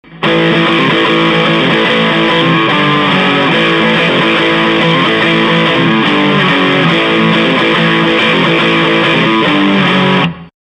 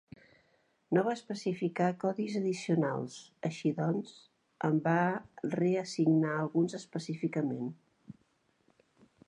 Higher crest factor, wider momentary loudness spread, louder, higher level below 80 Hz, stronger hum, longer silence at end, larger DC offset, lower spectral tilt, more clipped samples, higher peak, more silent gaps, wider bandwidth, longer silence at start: second, 10 dB vs 18 dB; second, 0 LU vs 10 LU; first, -9 LUFS vs -33 LUFS; first, -46 dBFS vs -78 dBFS; neither; second, 0.2 s vs 1.15 s; neither; about the same, -6 dB/octave vs -7 dB/octave; neither; first, 0 dBFS vs -14 dBFS; neither; about the same, 10 kHz vs 10.5 kHz; second, 0.1 s vs 0.9 s